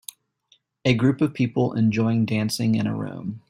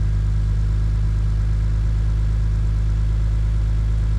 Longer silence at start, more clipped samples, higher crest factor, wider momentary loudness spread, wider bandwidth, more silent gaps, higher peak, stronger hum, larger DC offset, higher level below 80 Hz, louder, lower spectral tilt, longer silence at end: first, 0.85 s vs 0 s; neither; first, 20 dB vs 8 dB; first, 8 LU vs 0 LU; first, 16 kHz vs 7.6 kHz; neither; first, -4 dBFS vs -12 dBFS; neither; neither; second, -58 dBFS vs -20 dBFS; about the same, -23 LUFS vs -22 LUFS; second, -6.5 dB/octave vs -8 dB/octave; about the same, 0.1 s vs 0 s